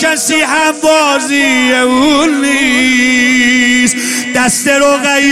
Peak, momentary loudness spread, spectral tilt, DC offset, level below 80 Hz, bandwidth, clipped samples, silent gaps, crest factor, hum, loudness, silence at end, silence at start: 0 dBFS; 3 LU; -1.5 dB/octave; under 0.1%; -44 dBFS; 15.5 kHz; under 0.1%; none; 10 dB; none; -9 LUFS; 0 s; 0 s